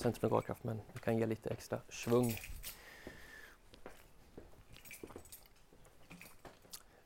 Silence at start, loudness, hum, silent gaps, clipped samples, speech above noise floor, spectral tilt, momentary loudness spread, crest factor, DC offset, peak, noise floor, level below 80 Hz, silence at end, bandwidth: 0 s; -39 LUFS; none; none; under 0.1%; 24 dB; -6 dB/octave; 24 LU; 24 dB; under 0.1%; -18 dBFS; -62 dBFS; -62 dBFS; 0.25 s; 16.5 kHz